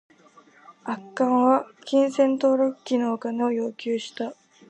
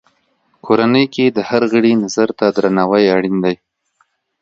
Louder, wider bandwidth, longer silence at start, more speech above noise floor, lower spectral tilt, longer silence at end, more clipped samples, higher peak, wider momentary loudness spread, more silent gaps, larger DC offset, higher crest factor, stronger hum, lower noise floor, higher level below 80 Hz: second, -24 LUFS vs -14 LUFS; about the same, 8.8 kHz vs 8 kHz; about the same, 0.7 s vs 0.65 s; second, 31 dB vs 48 dB; about the same, -5 dB/octave vs -6 dB/octave; second, 0.35 s vs 0.85 s; neither; second, -6 dBFS vs 0 dBFS; first, 13 LU vs 5 LU; neither; neither; about the same, 18 dB vs 14 dB; neither; second, -54 dBFS vs -61 dBFS; second, -82 dBFS vs -58 dBFS